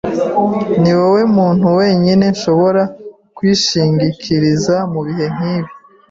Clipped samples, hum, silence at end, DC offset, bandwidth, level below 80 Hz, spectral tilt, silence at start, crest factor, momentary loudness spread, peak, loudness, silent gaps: under 0.1%; none; 0.35 s; under 0.1%; 7.8 kHz; -48 dBFS; -6 dB/octave; 0.05 s; 10 dB; 8 LU; -2 dBFS; -13 LUFS; none